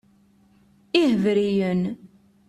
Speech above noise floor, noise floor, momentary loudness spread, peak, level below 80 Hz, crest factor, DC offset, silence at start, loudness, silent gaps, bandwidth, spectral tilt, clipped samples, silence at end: 37 dB; -58 dBFS; 10 LU; -4 dBFS; -62 dBFS; 20 dB; under 0.1%; 0.95 s; -22 LUFS; none; 12 kHz; -7 dB/octave; under 0.1%; 0.4 s